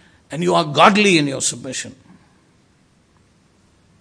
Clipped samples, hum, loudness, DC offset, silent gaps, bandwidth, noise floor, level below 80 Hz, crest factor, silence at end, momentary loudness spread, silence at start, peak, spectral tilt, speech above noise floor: under 0.1%; none; -16 LUFS; under 0.1%; none; 11 kHz; -56 dBFS; -62 dBFS; 20 dB; 2.1 s; 17 LU; 0.3 s; 0 dBFS; -3.5 dB/octave; 40 dB